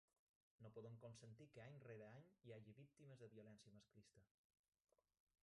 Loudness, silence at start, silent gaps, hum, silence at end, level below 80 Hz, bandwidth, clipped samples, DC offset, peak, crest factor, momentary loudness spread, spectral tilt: -64 LUFS; 0.6 s; none; none; 1.15 s; under -90 dBFS; 11 kHz; under 0.1%; under 0.1%; -48 dBFS; 18 dB; 6 LU; -6.5 dB/octave